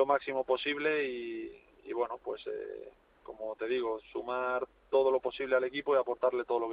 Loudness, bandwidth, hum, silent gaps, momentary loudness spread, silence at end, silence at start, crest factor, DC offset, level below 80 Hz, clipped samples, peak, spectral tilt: -33 LUFS; 5 kHz; none; none; 13 LU; 0 s; 0 s; 18 dB; under 0.1%; -70 dBFS; under 0.1%; -14 dBFS; -7 dB/octave